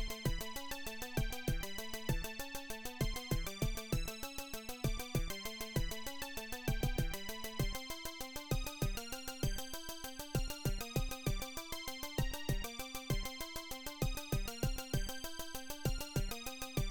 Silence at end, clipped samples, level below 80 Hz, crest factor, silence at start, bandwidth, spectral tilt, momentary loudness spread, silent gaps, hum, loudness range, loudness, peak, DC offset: 0 s; under 0.1%; -44 dBFS; 18 dB; 0 s; 19 kHz; -4 dB/octave; 6 LU; none; none; 1 LU; -41 LUFS; -22 dBFS; under 0.1%